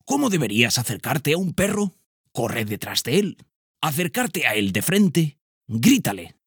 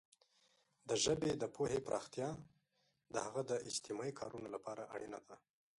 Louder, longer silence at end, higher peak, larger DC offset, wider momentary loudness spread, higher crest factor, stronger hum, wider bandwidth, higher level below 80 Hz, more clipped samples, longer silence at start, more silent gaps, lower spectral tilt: first, -22 LUFS vs -42 LUFS; second, 0.2 s vs 0.4 s; first, -2 dBFS vs -24 dBFS; neither; second, 9 LU vs 13 LU; about the same, 20 dB vs 20 dB; neither; first, over 20 kHz vs 11.5 kHz; first, -56 dBFS vs -72 dBFS; neither; second, 0.05 s vs 0.85 s; first, 2.06-2.24 s, 3.56-3.74 s, 5.41-5.61 s vs none; about the same, -4.5 dB/octave vs -3.5 dB/octave